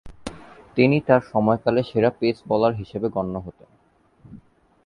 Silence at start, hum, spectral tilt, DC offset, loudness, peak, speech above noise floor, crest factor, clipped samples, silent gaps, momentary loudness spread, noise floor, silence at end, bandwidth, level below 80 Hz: 0.05 s; none; -8 dB/octave; under 0.1%; -21 LUFS; -4 dBFS; 38 dB; 20 dB; under 0.1%; none; 18 LU; -59 dBFS; 0.5 s; 11 kHz; -52 dBFS